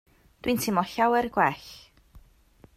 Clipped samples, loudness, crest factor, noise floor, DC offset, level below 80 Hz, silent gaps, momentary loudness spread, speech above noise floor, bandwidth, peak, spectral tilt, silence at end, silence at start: under 0.1%; -26 LUFS; 20 dB; -57 dBFS; under 0.1%; -56 dBFS; none; 14 LU; 32 dB; 16 kHz; -8 dBFS; -4.5 dB/octave; 0.55 s; 0.45 s